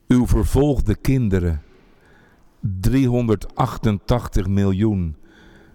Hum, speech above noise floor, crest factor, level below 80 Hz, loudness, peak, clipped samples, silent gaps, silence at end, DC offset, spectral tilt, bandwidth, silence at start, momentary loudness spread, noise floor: none; 33 dB; 14 dB; -28 dBFS; -20 LUFS; -4 dBFS; under 0.1%; none; 0.6 s; under 0.1%; -8 dB/octave; 18.5 kHz; 0.1 s; 10 LU; -51 dBFS